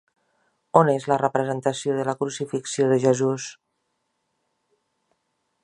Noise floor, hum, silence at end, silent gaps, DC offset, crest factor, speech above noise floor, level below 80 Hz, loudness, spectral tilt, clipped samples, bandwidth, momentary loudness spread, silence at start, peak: -75 dBFS; none; 2.1 s; none; under 0.1%; 24 dB; 53 dB; -70 dBFS; -23 LUFS; -5.5 dB/octave; under 0.1%; 11 kHz; 9 LU; 0.75 s; -2 dBFS